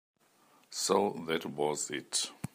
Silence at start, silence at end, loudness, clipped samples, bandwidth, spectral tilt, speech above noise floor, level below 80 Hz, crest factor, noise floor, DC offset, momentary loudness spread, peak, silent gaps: 0.7 s; 0.1 s; -33 LUFS; under 0.1%; 15.5 kHz; -2.5 dB/octave; 33 dB; -76 dBFS; 22 dB; -66 dBFS; under 0.1%; 6 LU; -12 dBFS; none